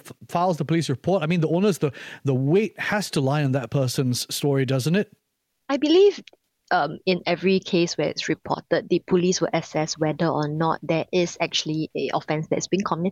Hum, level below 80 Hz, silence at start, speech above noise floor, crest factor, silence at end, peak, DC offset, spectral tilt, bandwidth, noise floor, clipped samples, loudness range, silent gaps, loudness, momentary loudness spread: none; -64 dBFS; 0.05 s; 53 dB; 16 dB; 0 s; -8 dBFS; under 0.1%; -5.5 dB/octave; 15.5 kHz; -75 dBFS; under 0.1%; 2 LU; none; -23 LUFS; 6 LU